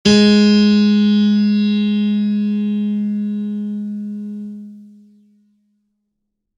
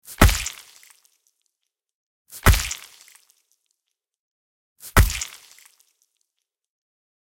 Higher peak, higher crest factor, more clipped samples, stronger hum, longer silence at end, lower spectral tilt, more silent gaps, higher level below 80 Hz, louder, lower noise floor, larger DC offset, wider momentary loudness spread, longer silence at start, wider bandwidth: about the same, 0 dBFS vs 0 dBFS; second, 16 dB vs 24 dB; neither; neither; second, 1.75 s vs 1.95 s; first, -6 dB/octave vs -4 dB/octave; second, none vs 1.94-2.25 s, 4.19-4.76 s; second, -52 dBFS vs -30 dBFS; first, -15 LUFS vs -21 LUFS; second, -74 dBFS vs -81 dBFS; neither; second, 17 LU vs 24 LU; about the same, 0.05 s vs 0.1 s; second, 8.8 kHz vs 17 kHz